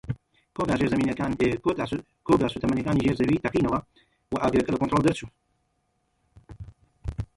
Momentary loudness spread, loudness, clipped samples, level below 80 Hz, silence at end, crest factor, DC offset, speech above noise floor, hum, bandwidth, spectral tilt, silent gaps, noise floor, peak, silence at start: 15 LU; -25 LUFS; under 0.1%; -46 dBFS; 0.1 s; 18 dB; under 0.1%; 48 dB; none; 11.5 kHz; -7 dB/octave; none; -73 dBFS; -8 dBFS; 0.05 s